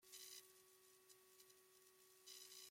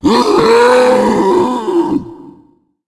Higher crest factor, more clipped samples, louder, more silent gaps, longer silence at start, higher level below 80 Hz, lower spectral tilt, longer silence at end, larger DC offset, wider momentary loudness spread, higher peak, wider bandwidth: first, 22 dB vs 12 dB; neither; second, -63 LUFS vs -11 LUFS; neither; about the same, 0 s vs 0.05 s; second, under -90 dBFS vs -44 dBFS; second, 0.5 dB/octave vs -5 dB/octave; second, 0 s vs 0.55 s; neither; first, 12 LU vs 7 LU; second, -44 dBFS vs 0 dBFS; first, 16.5 kHz vs 12 kHz